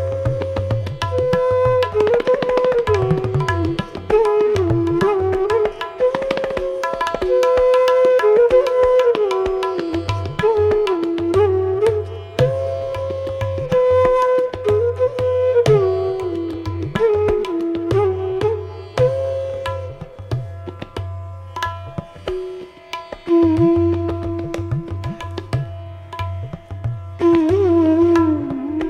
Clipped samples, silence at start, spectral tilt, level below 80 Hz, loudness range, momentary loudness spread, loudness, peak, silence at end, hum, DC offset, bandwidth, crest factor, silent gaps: under 0.1%; 0 s; -7.5 dB/octave; -40 dBFS; 8 LU; 14 LU; -18 LUFS; -2 dBFS; 0 s; none; under 0.1%; 11.5 kHz; 16 dB; none